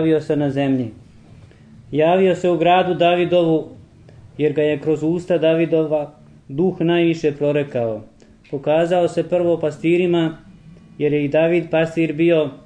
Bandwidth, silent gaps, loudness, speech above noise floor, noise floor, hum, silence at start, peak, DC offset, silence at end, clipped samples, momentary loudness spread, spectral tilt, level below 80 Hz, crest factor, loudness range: 9.2 kHz; none; -18 LUFS; 27 dB; -44 dBFS; none; 0 s; -2 dBFS; under 0.1%; 0.1 s; under 0.1%; 10 LU; -7.5 dB/octave; -56 dBFS; 16 dB; 2 LU